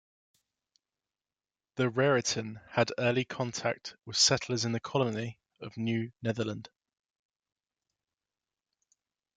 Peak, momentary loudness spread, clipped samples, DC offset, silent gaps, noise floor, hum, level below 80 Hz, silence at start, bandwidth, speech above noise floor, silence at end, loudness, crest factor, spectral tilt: -12 dBFS; 15 LU; under 0.1%; under 0.1%; none; under -90 dBFS; none; -72 dBFS; 1.75 s; 9.6 kHz; over 59 dB; 2.75 s; -30 LUFS; 22 dB; -3.5 dB/octave